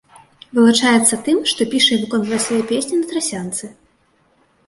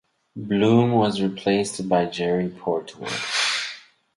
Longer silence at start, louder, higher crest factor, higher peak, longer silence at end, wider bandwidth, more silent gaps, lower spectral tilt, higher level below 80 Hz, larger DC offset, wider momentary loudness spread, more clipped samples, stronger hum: first, 0.55 s vs 0.35 s; first, -16 LUFS vs -22 LUFS; about the same, 18 dB vs 18 dB; first, 0 dBFS vs -6 dBFS; first, 0.95 s vs 0.35 s; about the same, 11.5 kHz vs 11.5 kHz; neither; second, -2.5 dB/octave vs -5 dB/octave; about the same, -60 dBFS vs -58 dBFS; neither; about the same, 12 LU vs 13 LU; neither; neither